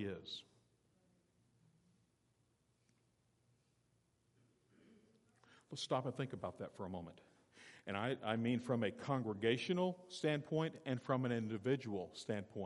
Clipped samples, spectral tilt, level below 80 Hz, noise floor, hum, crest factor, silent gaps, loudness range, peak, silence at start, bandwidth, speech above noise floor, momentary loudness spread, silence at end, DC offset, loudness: under 0.1%; -6 dB/octave; -84 dBFS; -79 dBFS; none; 22 dB; none; 10 LU; -22 dBFS; 0 s; 11.5 kHz; 38 dB; 11 LU; 0 s; under 0.1%; -41 LUFS